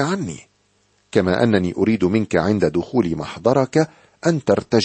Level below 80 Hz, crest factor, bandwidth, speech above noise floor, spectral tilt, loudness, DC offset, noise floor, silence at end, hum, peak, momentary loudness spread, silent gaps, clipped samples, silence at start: -50 dBFS; 18 dB; 8.8 kHz; 44 dB; -6.5 dB/octave; -19 LUFS; under 0.1%; -62 dBFS; 0 s; 50 Hz at -45 dBFS; -2 dBFS; 6 LU; none; under 0.1%; 0 s